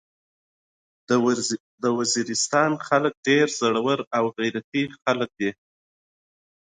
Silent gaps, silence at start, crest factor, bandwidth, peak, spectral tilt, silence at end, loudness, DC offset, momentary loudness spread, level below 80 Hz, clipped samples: 1.60-1.78 s, 3.17-3.23 s, 4.07-4.11 s, 4.64-4.72 s; 1.1 s; 18 dB; 9.6 kHz; -6 dBFS; -3.5 dB/octave; 1.15 s; -23 LUFS; under 0.1%; 7 LU; -70 dBFS; under 0.1%